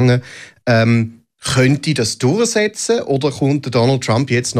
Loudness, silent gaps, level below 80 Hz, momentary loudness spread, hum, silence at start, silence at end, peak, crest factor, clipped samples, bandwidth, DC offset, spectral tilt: -16 LUFS; none; -48 dBFS; 5 LU; none; 0 s; 0 s; -2 dBFS; 14 dB; under 0.1%; 14 kHz; under 0.1%; -5 dB/octave